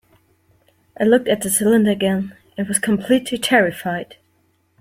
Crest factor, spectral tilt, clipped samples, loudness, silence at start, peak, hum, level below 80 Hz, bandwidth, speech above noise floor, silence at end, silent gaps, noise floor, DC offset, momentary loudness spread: 18 dB; -4 dB/octave; under 0.1%; -18 LUFS; 1 s; -2 dBFS; none; -58 dBFS; 16.5 kHz; 45 dB; 0.75 s; none; -62 dBFS; under 0.1%; 12 LU